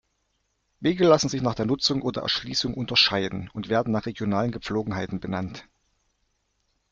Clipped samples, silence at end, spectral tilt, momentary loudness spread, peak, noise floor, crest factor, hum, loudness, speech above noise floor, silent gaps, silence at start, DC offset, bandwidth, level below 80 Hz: under 0.1%; 1.3 s; -4.5 dB/octave; 12 LU; -6 dBFS; -73 dBFS; 20 dB; none; -24 LUFS; 49 dB; none; 0.8 s; under 0.1%; 7.8 kHz; -54 dBFS